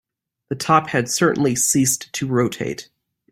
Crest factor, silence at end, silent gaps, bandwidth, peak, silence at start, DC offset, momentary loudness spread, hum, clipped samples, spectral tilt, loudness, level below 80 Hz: 18 dB; 0.5 s; none; 16.5 kHz; -2 dBFS; 0.5 s; under 0.1%; 12 LU; none; under 0.1%; -4 dB/octave; -19 LUFS; -56 dBFS